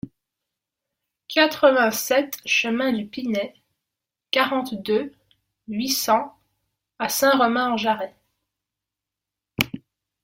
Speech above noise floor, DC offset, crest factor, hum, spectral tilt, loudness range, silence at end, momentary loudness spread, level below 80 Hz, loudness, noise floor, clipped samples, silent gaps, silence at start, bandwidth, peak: 65 dB; under 0.1%; 22 dB; none; -3 dB/octave; 4 LU; 0.45 s; 16 LU; -62 dBFS; -22 LUFS; -87 dBFS; under 0.1%; none; 0.05 s; 16.5 kHz; -2 dBFS